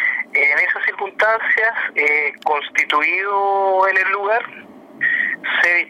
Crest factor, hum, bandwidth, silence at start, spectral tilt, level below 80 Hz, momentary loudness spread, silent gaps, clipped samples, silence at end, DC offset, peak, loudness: 12 dB; none; 16 kHz; 0 s; -2 dB/octave; -70 dBFS; 6 LU; none; under 0.1%; 0 s; under 0.1%; -6 dBFS; -16 LUFS